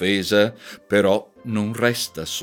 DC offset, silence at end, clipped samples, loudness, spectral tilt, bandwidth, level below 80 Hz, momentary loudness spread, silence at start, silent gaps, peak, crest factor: under 0.1%; 0 s; under 0.1%; -21 LUFS; -4.5 dB/octave; 19 kHz; -58 dBFS; 7 LU; 0 s; none; -4 dBFS; 18 dB